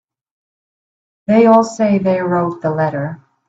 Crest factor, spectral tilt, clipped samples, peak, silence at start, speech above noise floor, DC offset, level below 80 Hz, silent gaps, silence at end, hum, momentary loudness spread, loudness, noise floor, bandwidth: 16 dB; -7.5 dB/octave; under 0.1%; 0 dBFS; 1.3 s; over 76 dB; under 0.1%; -58 dBFS; none; 0.3 s; none; 14 LU; -14 LUFS; under -90 dBFS; 8 kHz